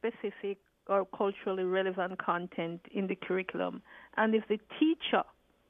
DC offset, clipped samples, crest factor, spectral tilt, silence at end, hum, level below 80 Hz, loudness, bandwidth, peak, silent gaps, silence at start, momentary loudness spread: under 0.1%; under 0.1%; 18 dB; -8.5 dB/octave; 0.45 s; none; -74 dBFS; -33 LUFS; 3.9 kHz; -14 dBFS; none; 0.05 s; 9 LU